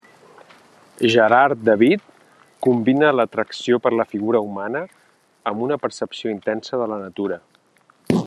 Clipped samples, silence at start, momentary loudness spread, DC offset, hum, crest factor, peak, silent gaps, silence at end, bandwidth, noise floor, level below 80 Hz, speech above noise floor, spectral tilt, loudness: under 0.1%; 1 s; 12 LU; under 0.1%; none; 20 dB; 0 dBFS; none; 0 s; 12.5 kHz; -58 dBFS; -68 dBFS; 39 dB; -6 dB/octave; -20 LUFS